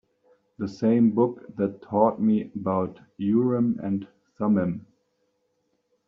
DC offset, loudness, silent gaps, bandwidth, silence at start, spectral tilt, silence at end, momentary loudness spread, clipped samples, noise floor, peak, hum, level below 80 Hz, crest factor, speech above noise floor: under 0.1%; -25 LUFS; none; 6.2 kHz; 0.6 s; -9.5 dB/octave; 1.25 s; 11 LU; under 0.1%; -73 dBFS; -6 dBFS; none; -66 dBFS; 20 dB; 49 dB